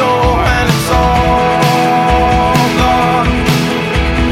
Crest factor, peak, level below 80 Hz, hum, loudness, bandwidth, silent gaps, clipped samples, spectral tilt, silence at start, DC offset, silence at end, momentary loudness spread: 10 dB; 0 dBFS; -20 dBFS; none; -11 LUFS; 16.5 kHz; none; under 0.1%; -5.5 dB/octave; 0 s; under 0.1%; 0 s; 3 LU